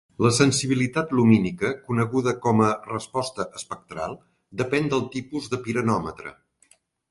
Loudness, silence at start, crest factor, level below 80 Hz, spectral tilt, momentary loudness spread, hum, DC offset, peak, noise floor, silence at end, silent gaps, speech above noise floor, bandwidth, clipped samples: -24 LUFS; 0.2 s; 22 dB; -56 dBFS; -5.5 dB/octave; 16 LU; none; under 0.1%; -2 dBFS; -61 dBFS; 0.8 s; none; 38 dB; 11.5 kHz; under 0.1%